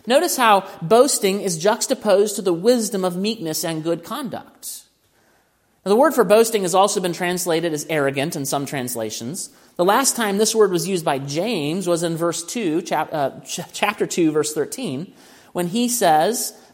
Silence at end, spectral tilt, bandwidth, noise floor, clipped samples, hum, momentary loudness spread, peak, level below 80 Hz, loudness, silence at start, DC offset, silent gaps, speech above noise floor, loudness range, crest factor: 0.2 s; -3.5 dB/octave; 16.5 kHz; -61 dBFS; under 0.1%; none; 13 LU; 0 dBFS; -68 dBFS; -20 LUFS; 0.05 s; under 0.1%; none; 42 dB; 4 LU; 20 dB